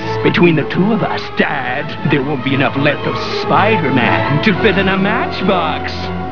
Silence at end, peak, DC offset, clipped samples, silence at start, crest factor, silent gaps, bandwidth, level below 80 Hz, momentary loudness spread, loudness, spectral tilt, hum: 0 s; 0 dBFS; 4%; under 0.1%; 0 s; 14 dB; none; 5.4 kHz; -40 dBFS; 7 LU; -14 LUFS; -7.5 dB/octave; none